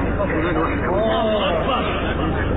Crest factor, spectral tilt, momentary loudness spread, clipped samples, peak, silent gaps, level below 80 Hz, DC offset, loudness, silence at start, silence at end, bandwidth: 10 dB; -9 dB/octave; 3 LU; under 0.1%; -10 dBFS; none; -28 dBFS; under 0.1%; -20 LUFS; 0 s; 0 s; 4.1 kHz